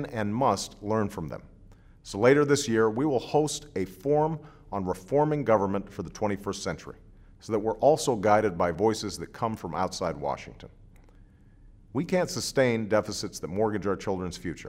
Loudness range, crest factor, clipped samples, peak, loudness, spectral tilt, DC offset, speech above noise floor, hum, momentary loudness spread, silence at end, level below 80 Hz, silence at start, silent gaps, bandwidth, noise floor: 5 LU; 20 dB; under 0.1%; -8 dBFS; -27 LUFS; -5 dB/octave; under 0.1%; 27 dB; none; 12 LU; 0 s; -54 dBFS; 0 s; none; 16 kHz; -54 dBFS